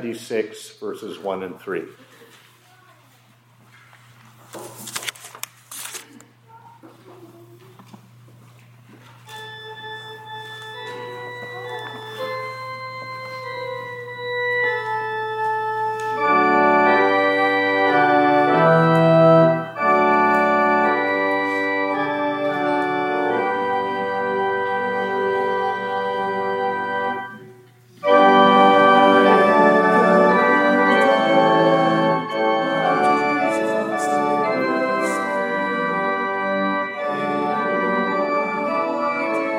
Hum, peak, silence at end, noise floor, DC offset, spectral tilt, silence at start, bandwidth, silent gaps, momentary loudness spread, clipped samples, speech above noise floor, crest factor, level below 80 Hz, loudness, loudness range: none; -2 dBFS; 0 s; -54 dBFS; under 0.1%; -5.5 dB/octave; 0 s; 17 kHz; none; 18 LU; under 0.1%; 24 dB; 18 dB; -74 dBFS; -18 LUFS; 20 LU